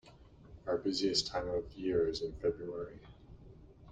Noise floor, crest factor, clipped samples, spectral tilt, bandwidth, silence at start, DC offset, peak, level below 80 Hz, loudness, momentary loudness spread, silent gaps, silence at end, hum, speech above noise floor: -58 dBFS; 22 dB; under 0.1%; -4.5 dB/octave; 9.4 kHz; 0.05 s; under 0.1%; -16 dBFS; -56 dBFS; -35 LUFS; 17 LU; none; 0 s; none; 22 dB